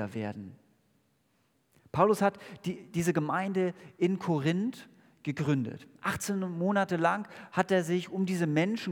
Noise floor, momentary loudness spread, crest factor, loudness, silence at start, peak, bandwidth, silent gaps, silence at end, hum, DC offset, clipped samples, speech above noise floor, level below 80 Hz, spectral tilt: -72 dBFS; 11 LU; 22 dB; -31 LUFS; 0 s; -10 dBFS; 18.5 kHz; none; 0 s; none; under 0.1%; under 0.1%; 42 dB; -72 dBFS; -6 dB/octave